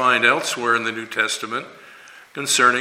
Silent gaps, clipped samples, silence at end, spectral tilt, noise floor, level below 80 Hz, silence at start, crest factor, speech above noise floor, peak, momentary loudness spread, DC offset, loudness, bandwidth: none; under 0.1%; 0 s; -1.5 dB/octave; -44 dBFS; -74 dBFS; 0 s; 20 dB; 24 dB; 0 dBFS; 14 LU; under 0.1%; -19 LUFS; 16.5 kHz